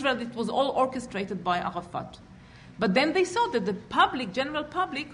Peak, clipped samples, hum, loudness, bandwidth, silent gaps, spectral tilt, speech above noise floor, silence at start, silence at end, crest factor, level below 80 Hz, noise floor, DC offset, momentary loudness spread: -10 dBFS; under 0.1%; none; -27 LUFS; 10.5 kHz; none; -5 dB/octave; 22 dB; 0 s; 0 s; 18 dB; -58 dBFS; -49 dBFS; under 0.1%; 9 LU